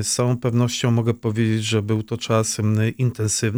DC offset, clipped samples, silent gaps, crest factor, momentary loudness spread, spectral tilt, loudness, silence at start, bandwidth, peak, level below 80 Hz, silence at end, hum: under 0.1%; under 0.1%; none; 14 dB; 3 LU; -5 dB/octave; -21 LUFS; 0 s; over 20 kHz; -6 dBFS; -58 dBFS; 0 s; none